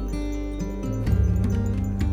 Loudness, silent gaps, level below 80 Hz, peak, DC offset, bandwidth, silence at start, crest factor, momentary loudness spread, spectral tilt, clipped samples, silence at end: -26 LUFS; none; -28 dBFS; -10 dBFS; under 0.1%; 14.5 kHz; 0 s; 14 dB; 8 LU; -8 dB/octave; under 0.1%; 0 s